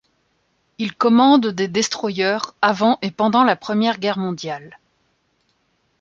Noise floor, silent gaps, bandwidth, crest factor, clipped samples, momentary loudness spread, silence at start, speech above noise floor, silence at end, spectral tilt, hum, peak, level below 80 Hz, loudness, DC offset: -66 dBFS; none; 7.6 kHz; 18 dB; under 0.1%; 13 LU; 0.8 s; 48 dB; 1.3 s; -4.5 dB/octave; none; -2 dBFS; -66 dBFS; -18 LUFS; under 0.1%